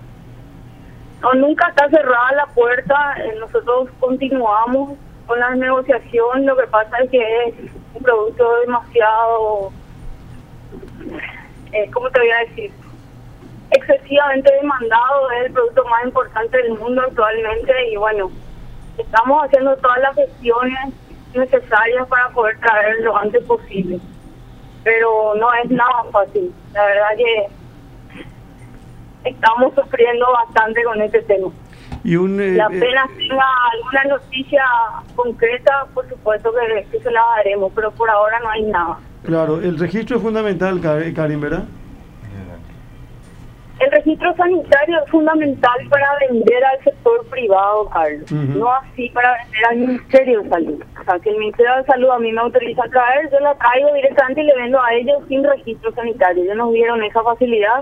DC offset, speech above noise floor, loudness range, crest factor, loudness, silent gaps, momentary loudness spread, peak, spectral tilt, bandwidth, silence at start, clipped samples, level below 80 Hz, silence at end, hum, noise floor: under 0.1%; 23 dB; 5 LU; 16 dB; -15 LUFS; none; 9 LU; 0 dBFS; -7 dB/octave; 7.6 kHz; 0 s; under 0.1%; -42 dBFS; 0 s; none; -38 dBFS